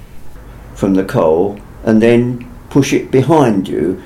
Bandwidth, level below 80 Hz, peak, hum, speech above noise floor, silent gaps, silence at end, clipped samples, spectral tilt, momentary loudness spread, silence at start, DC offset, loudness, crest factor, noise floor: 15.5 kHz; -38 dBFS; 0 dBFS; none; 20 dB; none; 0 s; under 0.1%; -7 dB/octave; 10 LU; 0 s; under 0.1%; -13 LUFS; 14 dB; -32 dBFS